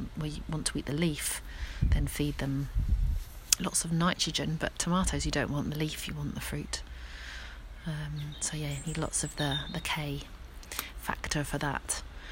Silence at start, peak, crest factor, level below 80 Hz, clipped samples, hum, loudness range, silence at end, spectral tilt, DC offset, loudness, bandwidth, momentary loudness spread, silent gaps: 0 s; 0 dBFS; 32 dB; -38 dBFS; under 0.1%; none; 6 LU; 0 s; -3.5 dB/octave; under 0.1%; -32 LUFS; 16.5 kHz; 11 LU; none